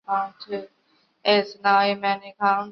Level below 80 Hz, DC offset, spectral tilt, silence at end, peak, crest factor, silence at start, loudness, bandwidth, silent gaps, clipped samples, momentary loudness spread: -74 dBFS; under 0.1%; -5.5 dB/octave; 0 s; -6 dBFS; 18 dB; 0.1 s; -22 LUFS; 6.2 kHz; none; under 0.1%; 14 LU